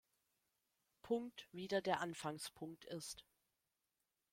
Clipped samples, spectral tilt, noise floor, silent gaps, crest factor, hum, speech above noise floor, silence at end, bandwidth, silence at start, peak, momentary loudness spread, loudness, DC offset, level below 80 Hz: under 0.1%; -4 dB/octave; -90 dBFS; none; 26 dB; none; 45 dB; 1.1 s; 16.5 kHz; 1.05 s; -20 dBFS; 12 LU; -45 LUFS; under 0.1%; -82 dBFS